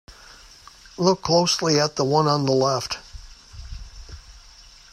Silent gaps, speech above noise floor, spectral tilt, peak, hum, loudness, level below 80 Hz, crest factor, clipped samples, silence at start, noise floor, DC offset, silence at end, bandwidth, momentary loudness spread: none; 27 dB; -4.5 dB/octave; -4 dBFS; none; -21 LUFS; -46 dBFS; 20 dB; under 0.1%; 0.1 s; -48 dBFS; under 0.1%; 0.55 s; 14.5 kHz; 24 LU